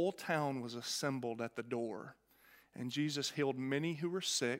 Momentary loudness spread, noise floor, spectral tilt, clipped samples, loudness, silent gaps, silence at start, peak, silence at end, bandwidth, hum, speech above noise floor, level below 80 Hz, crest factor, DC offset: 9 LU; -66 dBFS; -4 dB/octave; under 0.1%; -38 LUFS; none; 0 s; -20 dBFS; 0 s; 16 kHz; none; 28 dB; -84 dBFS; 18 dB; under 0.1%